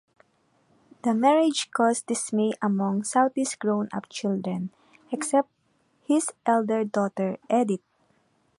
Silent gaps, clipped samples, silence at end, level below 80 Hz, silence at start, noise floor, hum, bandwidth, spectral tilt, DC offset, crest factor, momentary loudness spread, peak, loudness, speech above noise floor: none; under 0.1%; 0.8 s; -76 dBFS; 1.05 s; -68 dBFS; none; 11.5 kHz; -5 dB/octave; under 0.1%; 18 dB; 9 LU; -8 dBFS; -25 LUFS; 43 dB